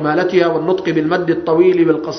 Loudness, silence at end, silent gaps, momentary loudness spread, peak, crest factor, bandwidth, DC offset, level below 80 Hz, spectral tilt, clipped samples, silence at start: -14 LUFS; 0 s; none; 5 LU; 0 dBFS; 14 dB; 6.4 kHz; under 0.1%; -54 dBFS; -7 dB/octave; under 0.1%; 0 s